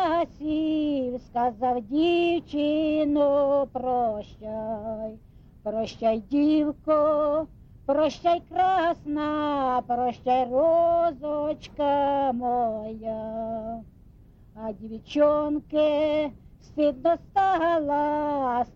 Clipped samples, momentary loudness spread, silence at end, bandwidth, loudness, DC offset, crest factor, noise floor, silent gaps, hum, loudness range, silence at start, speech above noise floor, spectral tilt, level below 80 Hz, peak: under 0.1%; 12 LU; 0.05 s; 7 kHz; -25 LUFS; under 0.1%; 14 dB; -52 dBFS; none; none; 4 LU; 0 s; 27 dB; -6.5 dB/octave; -52 dBFS; -12 dBFS